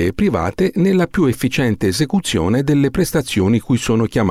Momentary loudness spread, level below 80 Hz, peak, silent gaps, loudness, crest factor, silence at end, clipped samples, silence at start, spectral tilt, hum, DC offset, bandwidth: 2 LU; -38 dBFS; -6 dBFS; none; -17 LUFS; 10 dB; 0 s; under 0.1%; 0 s; -6 dB/octave; none; under 0.1%; 15.5 kHz